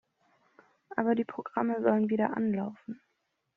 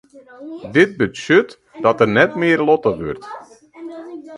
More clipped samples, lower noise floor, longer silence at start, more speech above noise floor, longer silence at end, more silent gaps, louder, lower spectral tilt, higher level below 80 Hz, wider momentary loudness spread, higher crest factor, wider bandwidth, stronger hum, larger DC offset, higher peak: neither; first, -79 dBFS vs -36 dBFS; first, 0.9 s vs 0.15 s; first, 50 dB vs 19 dB; first, 0.6 s vs 0 s; neither; second, -30 LUFS vs -16 LUFS; about the same, -7 dB/octave vs -6 dB/octave; second, -76 dBFS vs -52 dBFS; second, 16 LU vs 20 LU; about the same, 20 dB vs 18 dB; second, 3.8 kHz vs 11 kHz; neither; neither; second, -12 dBFS vs 0 dBFS